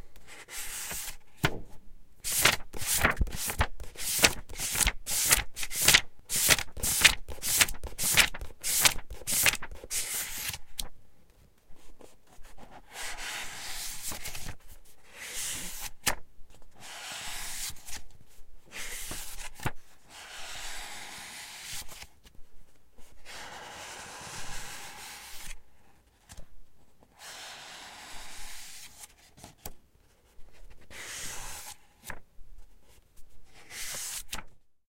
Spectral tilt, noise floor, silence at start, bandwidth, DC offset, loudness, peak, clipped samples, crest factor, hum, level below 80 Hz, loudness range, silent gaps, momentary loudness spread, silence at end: -0.5 dB/octave; -62 dBFS; 0 s; 17 kHz; under 0.1%; -29 LUFS; -4 dBFS; under 0.1%; 30 dB; none; -46 dBFS; 21 LU; none; 22 LU; 0.3 s